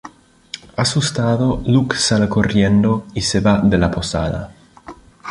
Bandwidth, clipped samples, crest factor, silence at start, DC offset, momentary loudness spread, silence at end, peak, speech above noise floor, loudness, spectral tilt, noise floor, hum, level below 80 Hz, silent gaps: 11 kHz; under 0.1%; 16 dB; 0.05 s; under 0.1%; 14 LU; 0 s; -2 dBFS; 25 dB; -16 LUFS; -5 dB/octave; -41 dBFS; none; -36 dBFS; none